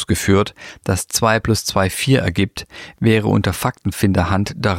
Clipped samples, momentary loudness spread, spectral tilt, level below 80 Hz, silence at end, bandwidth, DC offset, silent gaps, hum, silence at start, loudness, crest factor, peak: under 0.1%; 7 LU; -5 dB/octave; -38 dBFS; 0 s; 16.5 kHz; under 0.1%; none; none; 0 s; -18 LUFS; 16 dB; -2 dBFS